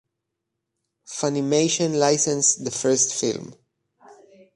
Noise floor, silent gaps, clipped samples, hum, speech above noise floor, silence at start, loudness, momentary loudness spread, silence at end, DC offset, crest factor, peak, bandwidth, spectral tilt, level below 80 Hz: -81 dBFS; none; under 0.1%; none; 60 dB; 1.1 s; -21 LUFS; 8 LU; 0.45 s; under 0.1%; 20 dB; -6 dBFS; 11.5 kHz; -3 dB/octave; -68 dBFS